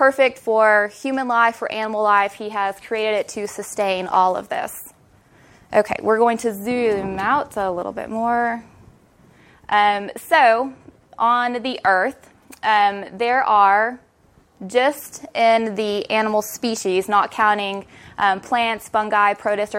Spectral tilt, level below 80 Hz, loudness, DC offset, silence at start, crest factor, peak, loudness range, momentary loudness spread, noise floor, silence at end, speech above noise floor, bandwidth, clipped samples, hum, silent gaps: -3.5 dB/octave; -58 dBFS; -19 LUFS; under 0.1%; 0 s; 18 dB; -2 dBFS; 4 LU; 10 LU; -55 dBFS; 0 s; 36 dB; 16.5 kHz; under 0.1%; none; none